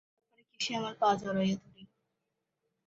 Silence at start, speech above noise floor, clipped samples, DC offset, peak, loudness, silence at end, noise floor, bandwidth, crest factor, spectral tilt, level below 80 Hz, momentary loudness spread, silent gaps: 0.6 s; 53 dB; under 0.1%; under 0.1%; -14 dBFS; -32 LUFS; 1 s; -85 dBFS; 7.6 kHz; 20 dB; -4 dB/octave; -72 dBFS; 7 LU; none